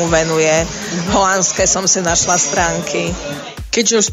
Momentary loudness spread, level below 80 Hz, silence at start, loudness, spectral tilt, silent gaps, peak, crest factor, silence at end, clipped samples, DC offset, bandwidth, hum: 9 LU; -34 dBFS; 0 s; -14 LUFS; -2.5 dB/octave; none; 0 dBFS; 14 dB; 0 s; under 0.1%; under 0.1%; 16 kHz; none